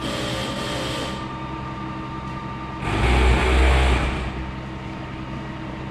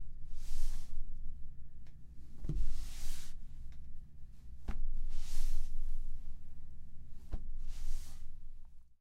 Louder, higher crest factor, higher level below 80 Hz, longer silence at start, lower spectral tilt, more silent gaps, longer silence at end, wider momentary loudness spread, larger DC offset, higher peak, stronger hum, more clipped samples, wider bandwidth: first, -24 LUFS vs -48 LUFS; about the same, 16 dB vs 14 dB; first, -26 dBFS vs -36 dBFS; about the same, 0 s vs 0 s; about the same, -5.5 dB/octave vs -5 dB/octave; neither; second, 0 s vs 0.2 s; about the same, 14 LU vs 15 LU; neither; first, -6 dBFS vs -18 dBFS; neither; neither; first, 12 kHz vs 6.8 kHz